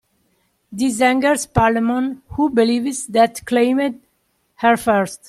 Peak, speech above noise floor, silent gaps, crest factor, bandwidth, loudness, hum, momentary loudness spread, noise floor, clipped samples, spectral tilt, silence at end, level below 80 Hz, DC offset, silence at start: -2 dBFS; 49 dB; none; 16 dB; 14.5 kHz; -18 LUFS; none; 7 LU; -66 dBFS; under 0.1%; -4.5 dB/octave; 0.1 s; -44 dBFS; under 0.1%; 0.7 s